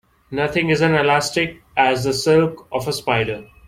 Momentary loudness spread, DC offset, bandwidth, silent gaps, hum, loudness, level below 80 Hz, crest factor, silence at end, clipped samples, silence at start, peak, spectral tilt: 8 LU; under 0.1%; 16 kHz; none; none; -18 LUFS; -50 dBFS; 18 dB; 0.25 s; under 0.1%; 0.3 s; -2 dBFS; -5 dB/octave